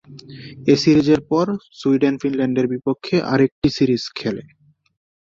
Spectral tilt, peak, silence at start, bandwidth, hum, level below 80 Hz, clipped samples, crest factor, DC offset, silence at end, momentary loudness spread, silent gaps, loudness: -6.5 dB/octave; -2 dBFS; 0.1 s; 7.6 kHz; none; -50 dBFS; under 0.1%; 18 dB; under 0.1%; 0.9 s; 12 LU; 3.52-3.62 s; -19 LUFS